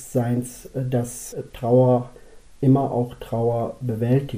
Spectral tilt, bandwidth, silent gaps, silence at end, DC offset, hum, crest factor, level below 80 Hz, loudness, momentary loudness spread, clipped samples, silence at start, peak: -8 dB/octave; 16 kHz; none; 0 s; under 0.1%; none; 14 dB; -48 dBFS; -22 LUFS; 13 LU; under 0.1%; 0 s; -8 dBFS